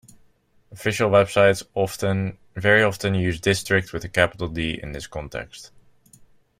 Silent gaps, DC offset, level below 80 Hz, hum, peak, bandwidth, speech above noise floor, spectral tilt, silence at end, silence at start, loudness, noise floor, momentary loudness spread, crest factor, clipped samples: none; under 0.1%; -48 dBFS; none; -2 dBFS; 16 kHz; 38 dB; -5 dB/octave; 0.95 s; 0.7 s; -22 LUFS; -59 dBFS; 15 LU; 20 dB; under 0.1%